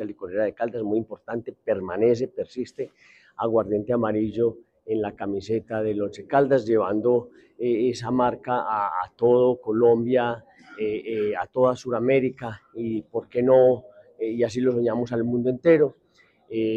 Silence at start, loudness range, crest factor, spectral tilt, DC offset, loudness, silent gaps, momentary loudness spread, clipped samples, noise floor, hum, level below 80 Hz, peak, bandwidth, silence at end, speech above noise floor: 0 s; 4 LU; 16 dB; -7.5 dB/octave; under 0.1%; -24 LUFS; none; 13 LU; under 0.1%; -60 dBFS; none; -60 dBFS; -6 dBFS; 8.4 kHz; 0 s; 37 dB